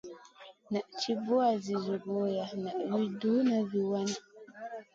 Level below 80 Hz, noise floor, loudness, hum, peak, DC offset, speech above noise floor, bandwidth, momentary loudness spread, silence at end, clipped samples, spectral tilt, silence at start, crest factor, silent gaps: -78 dBFS; -55 dBFS; -32 LUFS; none; -16 dBFS; under 0.1%; 24 dB; 7.8 kHz; 15 LU; 0.1 s; under 0.1%; -5.5 dB/octave; 0.05 s; 16 dB; none